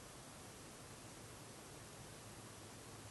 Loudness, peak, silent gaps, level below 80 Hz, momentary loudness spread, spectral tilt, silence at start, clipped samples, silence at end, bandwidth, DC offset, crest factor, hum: -55 LUFS; -42 dBFS; none; -70 dBFS; 0 LU; -3.5 dB/octave; 0 s; under 0.1%; 0 s; 12.5 kHz; under 0.1%; 14 dB; none